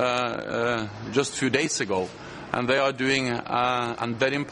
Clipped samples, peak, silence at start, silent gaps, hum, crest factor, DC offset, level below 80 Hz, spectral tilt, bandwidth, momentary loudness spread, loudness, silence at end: under 0.1%; -4 dBFS; 0 s; none; none; 20 dB; under 0.1%; -58 dBFS; -4 dB/octave; 11.5 kHz; 6 LU; -25 LUFS; 0 s